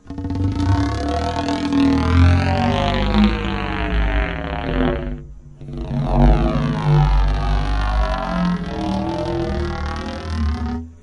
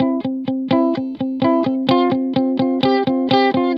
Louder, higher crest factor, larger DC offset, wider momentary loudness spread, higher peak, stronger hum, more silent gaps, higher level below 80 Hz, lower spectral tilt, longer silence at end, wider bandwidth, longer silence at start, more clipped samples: about the same, -20 LUFS vs -18 LUFS; about the same, 18 dB vs 16 dB; neither; first, 10 LU vs 7 LU; about the same, 0 dBFS vs 0 dBFS; neither; neither; first, -24 dBFS vs -62 dBFS; about the same, -7.5 dB/octave vs -8 dB/octave; about the same, 0.05 s vs 0 s; first, 9.8 kHz vs 6 kHz; about the same, 0.05 s vs 0 s; neither